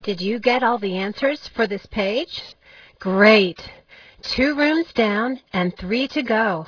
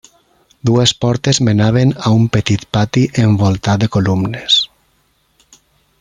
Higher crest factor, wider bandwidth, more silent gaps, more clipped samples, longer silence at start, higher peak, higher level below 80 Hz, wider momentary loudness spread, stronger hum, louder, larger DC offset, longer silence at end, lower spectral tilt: first, 20 dB vs 14 dB; second, 5.4 kHz vs 11 kHz; neither; neither; second, 0 s vs 0.65 s; about the same, 0 dBFS vs 0 dBFS; second, -50 dBFS vs -44 dBFS; first, 15 LU vs 4 LU; neither; second, -20 LUFS vs -14 LUFS; neither; second, 0 s vs 1.35 s; about the same, -6 dB/octave vs -5.5 dB/octave